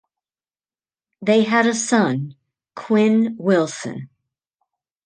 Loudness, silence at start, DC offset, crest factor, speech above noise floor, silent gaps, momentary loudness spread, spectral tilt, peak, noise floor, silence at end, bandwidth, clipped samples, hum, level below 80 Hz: -18 LUFS; 1.2 s; under 0.1%; 18 dB; over 72 dB; none; 16 LU; -5 dB/octave; -2 dBFS; under -90 dBFS; 1 s; 9.8 kHz; under 0.1%; none; -70 dBFS